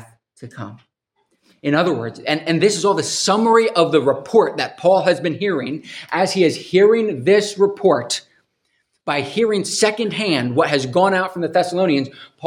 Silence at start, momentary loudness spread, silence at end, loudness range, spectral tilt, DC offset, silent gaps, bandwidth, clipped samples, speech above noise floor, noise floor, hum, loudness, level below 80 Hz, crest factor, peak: 0 s; 10 LU; 0 s; 3 LU; -4.5 dB/octave; under 0.1%; none; 14.5 kHz; under 0.1%; 51 dB; -68 dBFS; none; -17 LUFS; -68 dBFS; 18 dB; 0 dBFS